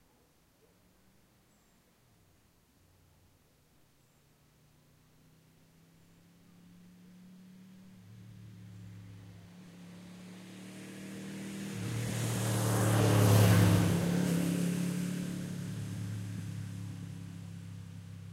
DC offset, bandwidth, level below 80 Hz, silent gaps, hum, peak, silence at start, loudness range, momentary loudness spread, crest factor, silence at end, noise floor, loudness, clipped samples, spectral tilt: under 0.1%; 16 kHz; -60 dBFS; none; none; -12 dBFS; 7.05 s; 25 LU; 28 LU; 24 dB; 0 s; -68 dBFS; -32 LUFS; under 0.1%; -6 dB/octave